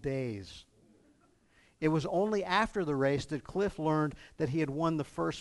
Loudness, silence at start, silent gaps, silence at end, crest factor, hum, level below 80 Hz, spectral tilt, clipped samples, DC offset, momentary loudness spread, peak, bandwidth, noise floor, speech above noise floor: -32 LUFS; 0 s; none; 0 s; 20 dB; none; -58 dBFS; -6.5 dB/octave; under 0.1%; under 0.1%; 8 LU; -14 dBFS; 11.5 kHz; -66 dBFS; 35 dB